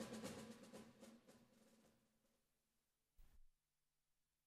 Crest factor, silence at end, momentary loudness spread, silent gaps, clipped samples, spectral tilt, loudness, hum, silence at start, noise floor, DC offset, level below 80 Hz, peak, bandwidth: 22 dB; 0.95 s; 13 LU; none; under 0.1%; -4 dB/octave; -58 LUFS; none; 0 s; under -90 dBFS; under 0.1%; -78 dBFS; -40 dBFS; 15 kHz